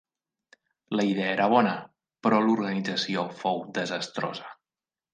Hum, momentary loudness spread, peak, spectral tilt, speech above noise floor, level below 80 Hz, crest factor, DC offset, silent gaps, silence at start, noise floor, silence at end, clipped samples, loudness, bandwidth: none; 11 LU; -6 dBFS; -5.5 dB/octave; over 64 dB; -76 dBFS; 20 dB; under 0.1%; none; 0.9 s; under -90 dBFS; 0.6 s; under 0.1%; -27 LUFS; 9.4 kHz